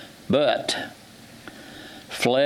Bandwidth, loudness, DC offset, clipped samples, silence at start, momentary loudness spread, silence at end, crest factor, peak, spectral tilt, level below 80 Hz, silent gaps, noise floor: 17.5 kHz; -24 LUFS; under 0.1%; under 0.1%; 0 s; 22 LU; 0 s; 18 dB; -6 dBFS; -4 dB/octave; -62 dBFS; none; -46 dBFS